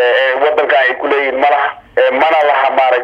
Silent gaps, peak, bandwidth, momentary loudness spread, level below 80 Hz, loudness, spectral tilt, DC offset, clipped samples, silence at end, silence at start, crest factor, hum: none; 0 dBFS; 7.4 kHz; 3 LU; -56 dBFS; -12 LUFS; -3.5 dB/octave; under 0.1%; under 0.1%; 0 s; 0 s; 12 dB; none